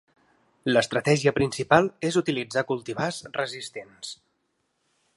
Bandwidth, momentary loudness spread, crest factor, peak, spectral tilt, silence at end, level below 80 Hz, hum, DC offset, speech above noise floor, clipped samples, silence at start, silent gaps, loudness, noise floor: 11.5 kHz; 17 LU; 24 dB; -2 dBFS; -5 dB/octave; 1 s; -60 dBFS; none; under 0.1%; 49 dB; under 0.1%; 0.65 s; none; -25 LUFS; -74 dBFS